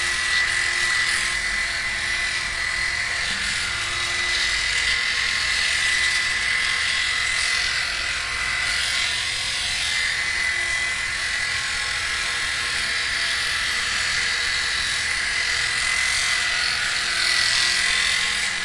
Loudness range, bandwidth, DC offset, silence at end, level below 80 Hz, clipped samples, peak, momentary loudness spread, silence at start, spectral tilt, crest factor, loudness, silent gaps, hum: 2 LU; 12 kHz; under 0.1%; 0 s; -44 dBFS; under 0.1%; -4 dBFS; 4 LU; 0 s; 0.5 dB/octave; 18 dB; -20 LUFS; none; none